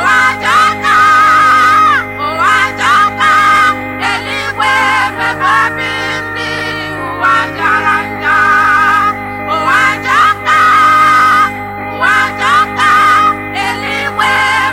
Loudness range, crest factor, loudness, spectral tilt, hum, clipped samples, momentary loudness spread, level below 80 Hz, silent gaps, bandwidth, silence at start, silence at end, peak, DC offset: 4 LU; 10 dB; -9 LUFS; -3 dB/octave; 50 Hz at -45 dBFS; under 0.1%; 10 LU; -42 dBFS; none; 16.5 kHz; 0 s; 0 s; 0 dBFS; under 0.1%